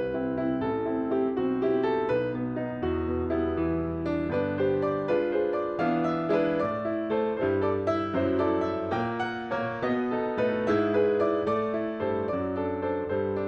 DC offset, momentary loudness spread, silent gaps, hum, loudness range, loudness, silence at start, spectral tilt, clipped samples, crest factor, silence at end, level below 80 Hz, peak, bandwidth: under 0.1%; 4 LU; none; none; 1 LU; -28 LUFS; 0 s; -8.5 dB/octave; under 0.1%; 14 dB; 0 s; -50 dBFS; -14 dBFS; 6.6 kHz